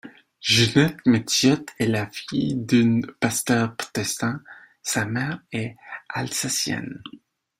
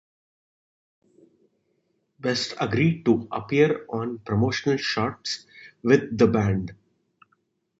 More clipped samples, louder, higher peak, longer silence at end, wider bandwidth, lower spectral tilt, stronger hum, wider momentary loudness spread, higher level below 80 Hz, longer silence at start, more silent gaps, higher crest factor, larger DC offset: neither; about the same, -23 LUFS vs -24 LUFS; about the same, -2 dBFS vs -4 dBFS; second, 0.45 s vs 1.05 s; first, 16 kHz vs 8 kHz; second, -4 dB/octave vs -6 dB/octave; neither; first, 14 LU vs 10 LU; about the same, -56 dBFS vs -52 dBFS; second, 0.05 s vs 2.25 s; neither; about the same, 20 dB vs 22 dB; neither